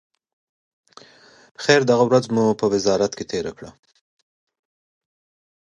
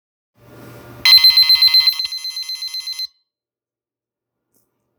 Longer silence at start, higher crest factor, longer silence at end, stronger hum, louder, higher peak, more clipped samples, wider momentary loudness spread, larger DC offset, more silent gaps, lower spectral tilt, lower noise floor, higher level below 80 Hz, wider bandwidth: first, 1.6 s vs 0.65 s; about the same, 22 dB vs 18 dB; about the same, 1.9 s vs 1.95 s; neither; second, -19 LUFS vs -10 LUFS; about the same, 0 dBFS vs 0 dBFS; neither; second, 11 LU vs 18 LU; neither; neither; first, -5 dB/octave vs 1.5 dB/octave; second, -50 dBFS vs under -90 dBFS; about the same, -60 dBFS vs -60 dBFS; second, 10.5 kHz vs over 20 kHz